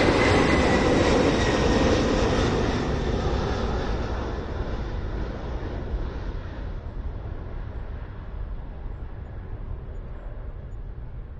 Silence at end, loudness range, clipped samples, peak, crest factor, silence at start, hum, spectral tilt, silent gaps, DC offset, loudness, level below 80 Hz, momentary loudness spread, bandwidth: 0 s; 16 LU; under 0.1%; -8 dBFS; 18 dB; 0 s; none; -6 dB/octave; none; under 0.1%; -25 LUFS; -32 dBFS; 19 LU; 10 kHz